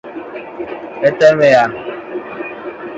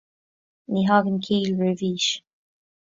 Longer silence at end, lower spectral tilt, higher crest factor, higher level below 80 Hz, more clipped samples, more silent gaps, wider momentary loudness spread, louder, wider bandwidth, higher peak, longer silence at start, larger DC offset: second, 0 s vs 0.7 s; about the same, -5.5 dB/octave vs -5 dB/octave; about the same, 16 dB vs 20 dB; first, -56 dBFS vs -64 dBFS; neither; neither; first, 18 LU vs 6 LU; first, -12 LUFS vs -23 LUFS; about the same, 7.8 kHz vs 7.8 kHz; first, 0 dBFS vs -4 dBFS; second, 0.05 s vs 0.7 s; neither